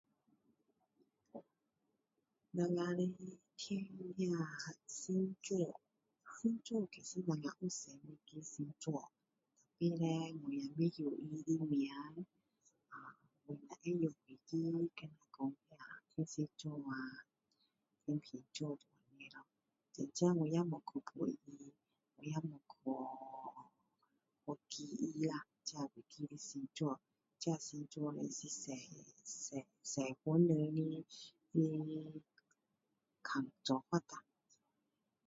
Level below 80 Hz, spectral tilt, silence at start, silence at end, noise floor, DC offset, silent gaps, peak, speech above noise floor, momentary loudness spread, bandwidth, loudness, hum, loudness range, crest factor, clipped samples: -86 dBFS; -6.5 dB/octave; 1.35 s; 1.05 s; -88 dBFS; under 0.1%; none; -22 dBFS; 46 dB; 18 LU; 7.6 kHz; -42 LUFS; none; 7 LU; 22 dB; under 0.1%